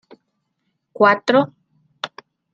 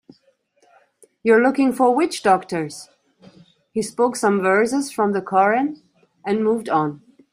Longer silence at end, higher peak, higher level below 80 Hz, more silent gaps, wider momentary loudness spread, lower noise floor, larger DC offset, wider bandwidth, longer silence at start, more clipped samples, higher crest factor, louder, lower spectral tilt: about the same, 0.45 s vs 0.35 s; about the same, -2 dBFS vs -2 dBFS; second, -72 dBFS vs -66 dBFS; neither; first, 17 LU vs 11 LU; first, -73 dBFS vs -62 dBFS; neither; second, 9.2 kHz vs 15.5 kHz; second, 1 s vs 1.25 s; neither; about the same, 20 dB vs 18 dB; about the same, -17 LUFS vs -19 LUFS; about the same, -5.5 dB/octave vs -5 dB/octave